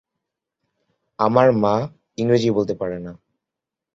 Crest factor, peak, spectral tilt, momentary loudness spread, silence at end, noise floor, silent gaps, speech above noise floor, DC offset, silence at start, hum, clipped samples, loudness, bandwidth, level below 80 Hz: 20 dB; -2 dBFS; -7.5 dB/octave; 16 LU; 0.8 s; -86 dBFS; none; 67 dB; under 0.1%; 1.2 s; none; under 0.1%; -19 LUFS; 7.6 kHz; -56 dBFS